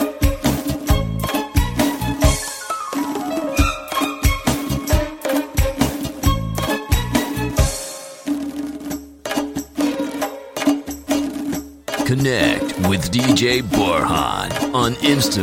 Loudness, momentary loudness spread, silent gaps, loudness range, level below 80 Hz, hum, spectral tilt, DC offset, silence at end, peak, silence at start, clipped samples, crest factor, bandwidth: -20 LUFS; 9 LU; none; 6 LU; -28 dBFS; none; -4.5 dB/octave; under 0.1%; 0 s; -2 dBFS; 0 s; under 0.1%; 18 dB; 16.5 kHz